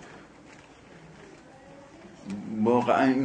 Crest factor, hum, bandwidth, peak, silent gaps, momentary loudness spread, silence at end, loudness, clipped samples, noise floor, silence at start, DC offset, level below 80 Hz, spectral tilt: 20 dB; none; 9.4 kHz; -10 dBFS; none; 27 LU; 0 s; -26 LUFS; under 0.1%; -51 dBFS; 0 s; under 0.1%; -66 dBFS; -7 dB/octave